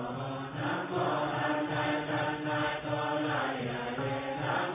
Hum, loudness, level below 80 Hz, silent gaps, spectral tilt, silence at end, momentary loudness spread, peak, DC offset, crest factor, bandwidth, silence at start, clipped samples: none; -32 LUFS; -62 dBFS; none; -4 dB/octave; 0 s; 4 LU; -18 dBFS; under 0.1%; 14 dB; 3.9 kHz; 0 s; under 0.1%